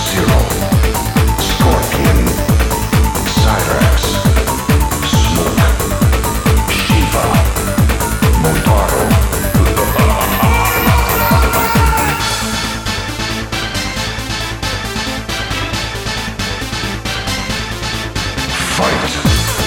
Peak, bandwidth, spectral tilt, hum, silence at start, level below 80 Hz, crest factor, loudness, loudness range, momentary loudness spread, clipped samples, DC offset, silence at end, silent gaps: 0 dBFS; 19.5 kHz; -4.5 dB/octave; none; 0 s; -18 dBFS; 12 dB; -14 LUFS; 6 LU; 7 LU; under 0.1%; under 0.1%; 0 s; none